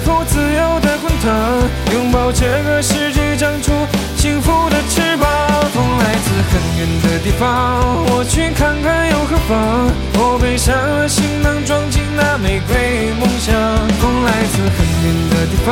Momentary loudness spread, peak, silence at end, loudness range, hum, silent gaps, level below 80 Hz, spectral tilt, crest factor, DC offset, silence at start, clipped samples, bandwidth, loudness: 2 LU; -2 dBFS; 0 s; 1 LU; none; none; -22 dBFS; -5 dB/octave; 12 dB; under 0.1%; 0 s; under 0.1%; 17 kHz; -14 LUFS